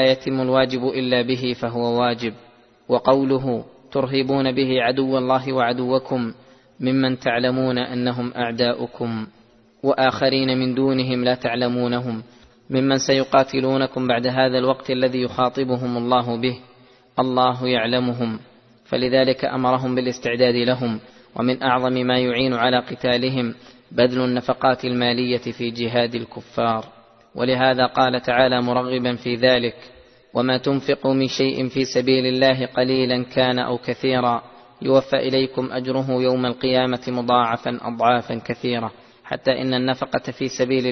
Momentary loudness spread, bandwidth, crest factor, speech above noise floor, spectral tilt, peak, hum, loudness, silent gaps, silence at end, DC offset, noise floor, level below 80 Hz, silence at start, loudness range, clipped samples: 9 LU; 6.4 kHz; 20 dB; 31 dB; -6 dB/octave; 0 dBFS; none; -21 LUFS; none; 0 s; under 0.1%; -51 dBFS; -56 dBFS; 0 s; 2 LU; under 0.1%